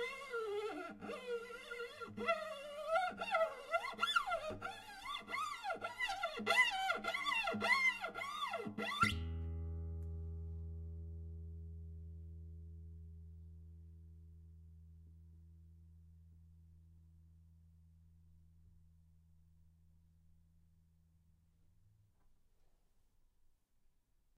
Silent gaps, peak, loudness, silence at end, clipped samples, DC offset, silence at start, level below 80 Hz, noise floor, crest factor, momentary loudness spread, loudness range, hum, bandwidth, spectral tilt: none; -20 dBFS; -40 LUFS; 4.7 s; under 0.1%; under 0.1%; 0 s; -58 dBFS; -75 dBFS; 24 dB; 23 LU; 21 LU; none; 15 kHz; -4 dB/octave